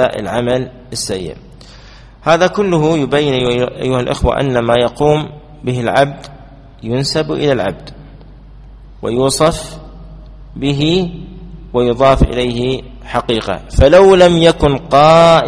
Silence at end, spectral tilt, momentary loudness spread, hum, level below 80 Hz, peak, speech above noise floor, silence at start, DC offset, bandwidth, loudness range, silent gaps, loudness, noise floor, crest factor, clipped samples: 0 s; -5.5 dB/octave; 17 LU; none; -28 dBFS; 0 dBFS; 25 dB; 0 s; under 0.1%; 11 kHz; 7 LU; none; -13 LUFS; -37 dBFS; 14 dB; 0.1%